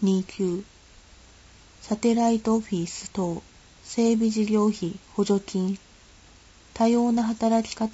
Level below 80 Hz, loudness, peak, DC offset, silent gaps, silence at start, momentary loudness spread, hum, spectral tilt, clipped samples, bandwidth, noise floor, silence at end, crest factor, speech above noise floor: -56 dBFS; -25 LUFS; -10 dBFS; under 0.1%; none; 0 s; 10 LU; none; -6 dB/octave; under 0.1%; 8 kHz; -52 dBFS; 0 s; 16 dB; 28 dB